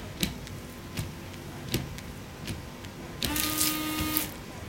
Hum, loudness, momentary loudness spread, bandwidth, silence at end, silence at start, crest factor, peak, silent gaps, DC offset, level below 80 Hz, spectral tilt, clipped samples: none; -32 LUFS; 15 LU; 17 kHz; 0 s; 0 s; 32 dB; -2 dBFS; none; under 0.1%; -48 dBFS; -3 dB/octave; under 0.1%